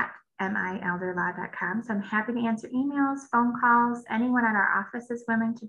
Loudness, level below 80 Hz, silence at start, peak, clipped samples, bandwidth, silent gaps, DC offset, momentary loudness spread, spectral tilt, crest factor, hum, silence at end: -27 LUFS; -68 dBFS; 0 s; -10 dBFS; under 0.1%; 9.6 kHz; none; under 0.1%; 8 LU; -6.5 dB/octave; 18 dB; none; 0 s